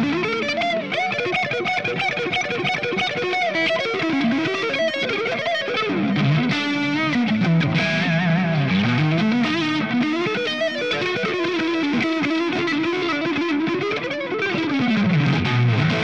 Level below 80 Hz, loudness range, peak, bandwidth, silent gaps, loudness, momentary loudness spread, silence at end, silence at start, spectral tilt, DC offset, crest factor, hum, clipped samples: -58 dBFS; 2 LU; -8 dBFS; 9 kHz; none; -21 LUFS; 3 LU; 0 s; 0 s; -6 dB/octave; 0.2%; 14 dB; none; under 0.1%